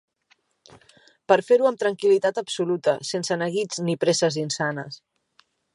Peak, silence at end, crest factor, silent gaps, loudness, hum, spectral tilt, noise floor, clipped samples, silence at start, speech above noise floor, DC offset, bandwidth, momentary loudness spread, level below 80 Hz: -2 dBFS; 0.8 s; 22 dB; none; -23 LUFS; none; -4 dB/octave; -65 dBFS; under 0.1%; 1.3 s; 43 dB; under 0.1%; 11.5 kHz; 8 LU; -74 dBFS